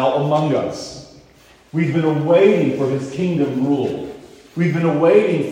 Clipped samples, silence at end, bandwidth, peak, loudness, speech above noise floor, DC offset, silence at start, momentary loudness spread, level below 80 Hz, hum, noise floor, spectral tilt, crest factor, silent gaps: under 0.1%; 0 s; 10.5 kHz; -2 dBFS; -17 LUFS; 32 dB; under 0.1%; 0 s; 16 LU; -56 dBFS; none; -49 dBFS; -7.5 dB/octave; 16 dB; none